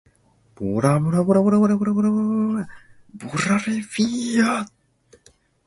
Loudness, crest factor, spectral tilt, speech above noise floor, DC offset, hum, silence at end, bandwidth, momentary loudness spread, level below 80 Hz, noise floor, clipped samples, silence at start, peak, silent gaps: -21 LUFS; 16 dB; -6.5 dB/octave; 39 dB; under 0.1%; none; 1 s; 11.5 kHz; 12 LU; -56 dBFS; -59 dBFS; under 0.1%; 0.6 s; -4 dBFS; none